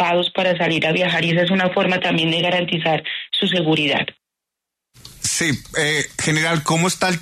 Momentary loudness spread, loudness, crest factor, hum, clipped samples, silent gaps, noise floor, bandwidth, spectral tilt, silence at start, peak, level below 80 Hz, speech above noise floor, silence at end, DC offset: 3 LU; -18 LUFS; 14 dB; none; under 0.1%; none; -83 dBFS; 13.5 kHz; -3.5 dB/octave; 0 s; -6 dBFS; -54 dBFS; 65 dB; 0 s; under 0.1%